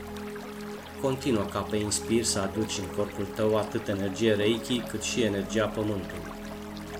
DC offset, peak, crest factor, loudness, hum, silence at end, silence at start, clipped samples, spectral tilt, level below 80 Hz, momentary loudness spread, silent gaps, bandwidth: under 0.1%; -10 dBFS; 18 dB; -29 LUFS; none; 0 s; 0 s; under 0.1%; -4.5 dB/octave; -52 dBFS; 13 LU; none; 16.5 kHz